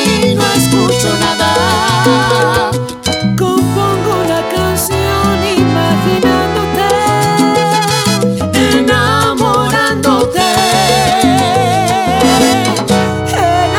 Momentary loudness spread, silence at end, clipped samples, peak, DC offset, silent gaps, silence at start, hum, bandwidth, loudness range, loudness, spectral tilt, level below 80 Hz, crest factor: 4 LU; 0 s; under 0.1%; 0 dBFS; under 0.1%; none; 0 s; none; 18 kHz; 2 LU; -11 LUFS; -4.5 dB/octave; -36 dBFS; 10 dB